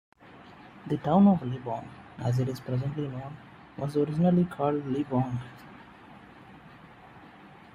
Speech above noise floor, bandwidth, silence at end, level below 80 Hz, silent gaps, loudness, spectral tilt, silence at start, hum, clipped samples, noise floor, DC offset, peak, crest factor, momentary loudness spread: 24 dB; 10.5 kHz; 0.2 s; -62 dBFS; none; -28 LUFS; -9 dB/octave; 0.35 s; none; under 0.1%; -51 dBFS; under 0.1%; -10 dBFS; 20 dB; 27 LU